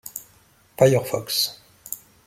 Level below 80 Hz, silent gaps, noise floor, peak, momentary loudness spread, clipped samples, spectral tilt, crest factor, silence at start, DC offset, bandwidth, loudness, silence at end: -60 dBFS; none; -57 dBFS; -2 dBFS; 19 LU; under 0.1%; -4 dB/octave; 22 dB; 0.05 s; under 0.1%; 16.5 kHz; -21 LUFS; 0.3 s